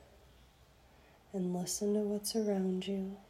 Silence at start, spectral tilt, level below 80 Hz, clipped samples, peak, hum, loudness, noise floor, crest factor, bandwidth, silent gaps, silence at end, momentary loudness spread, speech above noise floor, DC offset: 1.35 s; -5 dB/octave; -66 dBFS; under 0.1%; -24 dBFS; none; -36 LUFS; -63 dBFS; 14 dB; 15.5 kHz; none; 0.05 s; 6 LU; 28 dB; under 0.1%